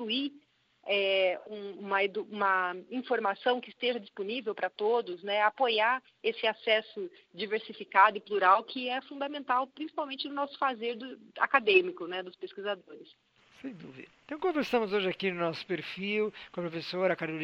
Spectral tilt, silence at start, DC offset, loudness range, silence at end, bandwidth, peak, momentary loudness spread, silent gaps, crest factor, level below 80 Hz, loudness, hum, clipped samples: -5.5 dB/octave; 0 s; under 0.1%; 5 LU; 0 s; 7.6 kHz; -8 dBFS; 16 LU; none; 24 dB; -78 dBFS; -30 LUFS; none; under 0.1%